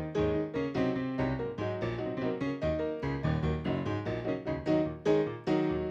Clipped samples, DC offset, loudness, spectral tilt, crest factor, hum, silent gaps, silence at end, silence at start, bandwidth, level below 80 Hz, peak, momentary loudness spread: under 0.1%; under 0.1%; -32 LUFS; -8 dB/octave; 16 dB; none; none; 0 s; 0 s; 7.6 kHz; -48 dBFS; -14 dBFS; 5 LU